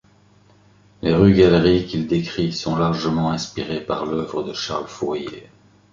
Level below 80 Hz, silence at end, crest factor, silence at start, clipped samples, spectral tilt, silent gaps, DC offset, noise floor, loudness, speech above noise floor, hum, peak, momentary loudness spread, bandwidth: -42 dBFS; 0.5 s; 18 dB; 1.05 s; under 0.1%; -6.5 dB/octave; none; under 0.1%; -54 dBFS; -20 LUFS; 34 dB; 50 Hz at -45 dBFS; -2 dBFS; 13 LU; 7.6 kHz